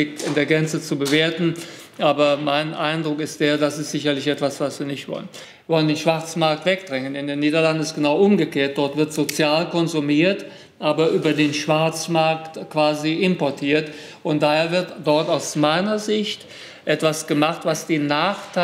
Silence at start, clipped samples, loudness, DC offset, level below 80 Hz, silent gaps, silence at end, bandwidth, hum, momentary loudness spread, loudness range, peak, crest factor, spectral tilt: 0 s; under 0.1%; -20 LUFS; under 0.1%; -68 dBFS; none; 0 s; 16 kHz; none; 9 LU; 3 LU; -2 dBFS; 20 dB; -5 dB/octave